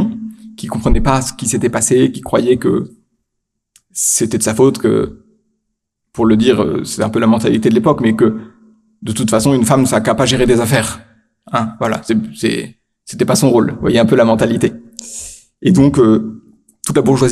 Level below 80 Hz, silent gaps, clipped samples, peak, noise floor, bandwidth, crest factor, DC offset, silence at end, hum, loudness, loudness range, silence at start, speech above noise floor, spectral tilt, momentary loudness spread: -30 dBFS; none; under 0.1%; 0 dBFS; -74 dBFS; 15 kHz; 14 dB; under 0.1%; 0 s; none; -14 LUFS; 3 LU; 0 s; 61 dB; -5 dB/octave; 16 LU